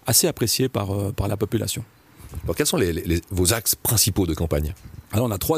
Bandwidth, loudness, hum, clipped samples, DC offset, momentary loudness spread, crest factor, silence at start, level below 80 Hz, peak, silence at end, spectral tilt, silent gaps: 15.5 kHz; -22 LUFS; none; under 0.1%; under 0.1%; 12 LU; 18 dB; 0.05 s; -38 dBFS; -4 dBFS; 0 s; -4 dB/octave; none